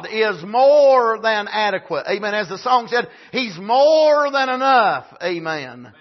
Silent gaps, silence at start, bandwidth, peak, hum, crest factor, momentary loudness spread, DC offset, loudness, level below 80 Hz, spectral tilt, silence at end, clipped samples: none; 0 s; 6.2 kHz; -4 dBFS; none; 14 dB; 12 LU; under 0.1%; -17 LUFS; -74 dBFS; -4 dB/octave; 0.1 s; under 0.1%